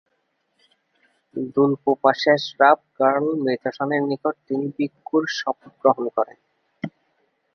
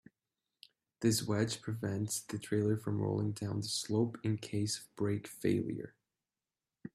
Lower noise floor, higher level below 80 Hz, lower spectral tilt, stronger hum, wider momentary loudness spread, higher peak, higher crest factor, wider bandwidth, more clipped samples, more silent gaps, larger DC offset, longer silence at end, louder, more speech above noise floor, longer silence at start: second, -71 dBFS vs under -90 dBFS; about the same, -72 dBFS vs -70 dBFS; about the same, -6 dB/octave vs -5 dB/octave; neither; first, 13 LU vs 6 LU; first, -2 dBFS vs -18 dBFS; about the same, 20 dB vs 18 dB; second, 6.6 kHz vs 15 kHz; neither; neither; neither; first, 0.65 s vs 0.05 s; first, -21 LUFS vs -36 LUFS; second, 50 dB vs over 55 dB; first, 1.35 s vs 1 s